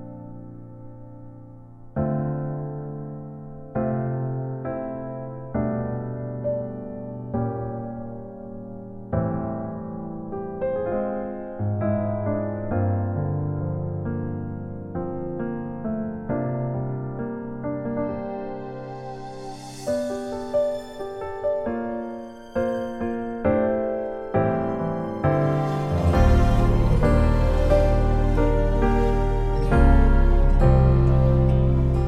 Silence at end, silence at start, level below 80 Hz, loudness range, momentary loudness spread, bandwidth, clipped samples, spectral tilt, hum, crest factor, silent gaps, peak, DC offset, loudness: 0 s; 0 s; -26 dBFS; 10 LU; 16 LU; 9.6 kHz; under 0.1%; -9 dB/octave; none; 18 dB; none; -6 dBFS; under 0.1%; -25 LUFS